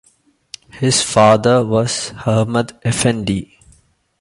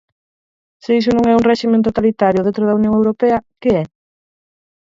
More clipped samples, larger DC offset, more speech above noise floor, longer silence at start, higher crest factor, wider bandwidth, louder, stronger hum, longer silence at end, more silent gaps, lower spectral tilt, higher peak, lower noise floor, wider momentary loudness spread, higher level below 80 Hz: neither; neither; second, 42 dB vs over 76 dB; second, 0.75 s vs 0.9 s; about the same, 16 dB vs 16 dB; first, 11.5 kHz vs 7.6 kHz; about the same, -15 LUFS vs -15 LUFS; neither; second, 0.75 s vs 1.1 s; neither; second, -4.5 dB/octave vs -7.5 dB/octave; about the same, 0 dBFS vs 0 dBFS; second, -57 dBFS vs under -90 dBFS; first, 13 LU vs 5 LU; about the same, -46 dBFS vs -46 dBFS